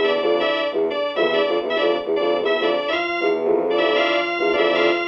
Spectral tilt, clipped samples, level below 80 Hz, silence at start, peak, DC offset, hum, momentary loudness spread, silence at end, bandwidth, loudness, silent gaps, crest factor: -5 dB/octave; under 0.1%; -62 dBFS; 0 s; -6 dBFS; under 0.1%; none; 3 LU; 0 s; 7 kHz; -20 LUFS; none; 14 dB